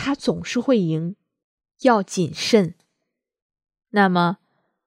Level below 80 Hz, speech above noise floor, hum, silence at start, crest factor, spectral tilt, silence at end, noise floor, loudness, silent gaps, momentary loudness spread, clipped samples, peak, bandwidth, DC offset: -60 dBFS; 60 dB; none; 0 s; 20 dB; -5.5 dB/octave; 0.5 s; -79 dBFS; -21 LUFS; 1.44-1.58 s, 3.42-3.49 s; 9 LU; under 0.1%; -2 dBFS; 14.5 kHz; under 0.1%